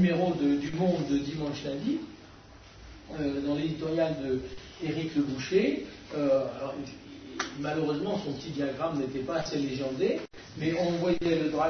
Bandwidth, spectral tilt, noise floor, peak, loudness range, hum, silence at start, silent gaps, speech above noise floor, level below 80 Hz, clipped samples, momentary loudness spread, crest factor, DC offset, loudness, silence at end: 6.6 kHz; -6.5 dB/octave; -51 dBFS; -12 dBFS; 3 LU; none; 0 s; none; 22 dB; -56 dBFS; under 0.1%; 14 LU; 18 dB; under 0.1%; -30 LUFS; 0 s